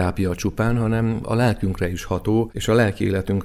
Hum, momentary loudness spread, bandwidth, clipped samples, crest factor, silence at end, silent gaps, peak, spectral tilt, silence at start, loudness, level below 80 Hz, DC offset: none; 5 LU; 15 kHz; under 0.1%; 16 dB; 0 s; none; -4 dBFS; -6.5 dB/octave; 0 s; -21 LUFS; -38 dBFS; under 0.1%